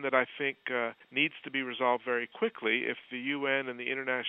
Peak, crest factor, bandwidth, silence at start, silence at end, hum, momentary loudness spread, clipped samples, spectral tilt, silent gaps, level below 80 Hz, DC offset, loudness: -10 dBFS; 22 dB; 4.2 kHz; 0 s; 0 s; none; 5 LU; under 0.1%; -7 dB/octave; none; -86 dBFS; under 0.1%; -32 LUFS